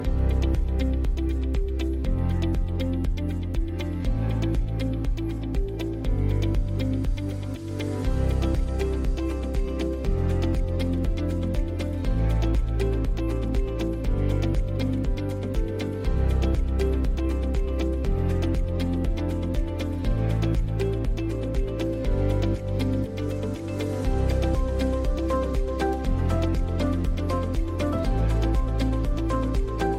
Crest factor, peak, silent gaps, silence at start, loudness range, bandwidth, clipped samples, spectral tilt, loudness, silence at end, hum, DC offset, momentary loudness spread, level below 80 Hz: 10 dB; -14 dBFS; none; 0 s; 2 LU; 13 kHz; under 0.1%; -8 dB/octave; -27 LUFS; 0 s; none; under 0.1%; 4 LU; -26 dBFS